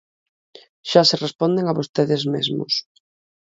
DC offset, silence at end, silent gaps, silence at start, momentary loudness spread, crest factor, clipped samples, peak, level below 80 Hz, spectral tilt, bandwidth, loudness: under 0.1%; 0.8 s; 1.35-1.39 s, 1.89-1.94 s; 0.85 s; 8 LU; 22 dB; under 0.1%; 0 dBFS; -66 dBFS; -5 dB/octave; 7.8 kHz; -20 LUFS